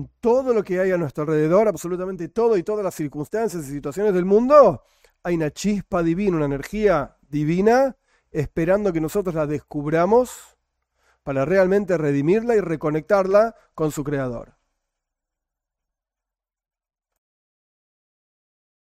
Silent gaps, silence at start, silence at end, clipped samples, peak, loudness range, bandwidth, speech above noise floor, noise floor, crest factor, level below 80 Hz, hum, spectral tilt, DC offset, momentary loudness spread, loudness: none; 0 s; 4.5 s; under 0.1%; -2 dBFS; 4 LU; 16 kHz; 68 dB; -88 dBFS; 20 dB; -48 dBFS; none; -7 dB/octave; under 0.1%; 10 LU; -21 LUFS